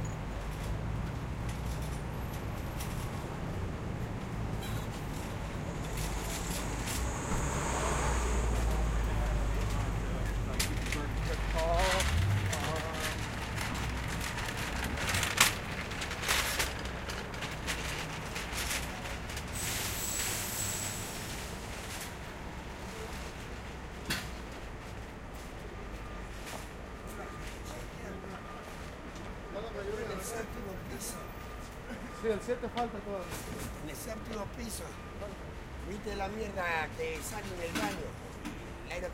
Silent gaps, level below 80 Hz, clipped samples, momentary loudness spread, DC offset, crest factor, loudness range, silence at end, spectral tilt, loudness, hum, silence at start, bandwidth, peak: none; -40 dBFS; under 0.1%; 12 LU; under 0.1%; 28 dB; 10 LU; 0 s; -3.5 dB/octave; -36 LUFS; none; 0 s; 16.5 kHz; -8 dBFS